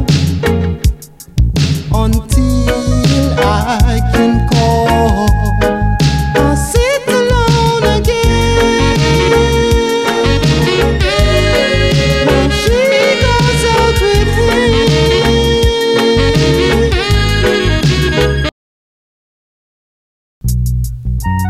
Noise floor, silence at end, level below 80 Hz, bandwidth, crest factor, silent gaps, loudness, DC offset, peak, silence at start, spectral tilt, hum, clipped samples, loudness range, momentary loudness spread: under -90 dBFS; 0 s; -18 dBFS; 15.5 kHz; 10 dB; 18.52-20.41 s; -11 LUFS; under 0.1%; 0 dBFS; 0 s; -5.5 dB/octave; none; under 0.1%; 3 LU; 4 LU